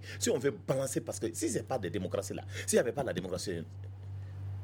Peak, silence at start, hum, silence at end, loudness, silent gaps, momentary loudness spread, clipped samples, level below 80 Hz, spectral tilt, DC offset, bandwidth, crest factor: -14 dBFS; 0 s; none; 0 s; -34 LUFS; none; 14 LU; under 0.1%; -66 dBFS; -4.5 dB/octave; under 0.1%; 18.5 kHz; 20 dB